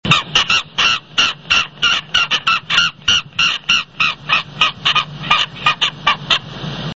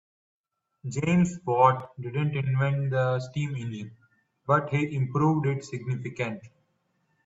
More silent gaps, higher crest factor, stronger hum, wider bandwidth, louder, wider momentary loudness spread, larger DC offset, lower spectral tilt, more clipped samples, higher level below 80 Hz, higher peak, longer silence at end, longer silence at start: neither; second, 16 dB vs 22 dB; neither; about the same, 8 kHz vs 8 kHz; first, -14 LUFS vs -27 LUFS; second, 4 LU vs 13 LU; first, 0.3% vs under 0.1%; second, -1.5 dB/octave vs -7.5 dB/octave; neither; first, -44 dBFS vs -62 dBFS; first, 0 dBFS vs -6 dBFS; second, 0 s vs 0.75 s; second, 0.05 s vs 0.85 s